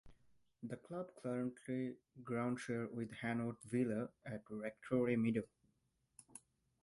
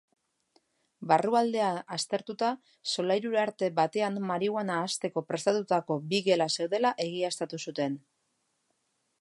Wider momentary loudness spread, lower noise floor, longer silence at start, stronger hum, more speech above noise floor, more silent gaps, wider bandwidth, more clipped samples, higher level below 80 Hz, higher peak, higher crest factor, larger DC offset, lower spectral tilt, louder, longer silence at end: first, 18 LU vs 7 LU; first, -81 dBFS vs -77 dBFS; second, 0.05 s vs 1 s; neither; second, 40 dB vs 48 dB; neither; about the same, 11.5 kHz vs 11.5 kHz; neither; first, -76 dBFS vs -82 dBFS; second, -24 dBFS vs -8 dBFS; about the same, 20 dB vs 22 dB; neither; first, -7 dB/octave vs -4 dB/octave; second, -42 LUFS vs -29 LUFS; second, 0.45 s vs 1.25 s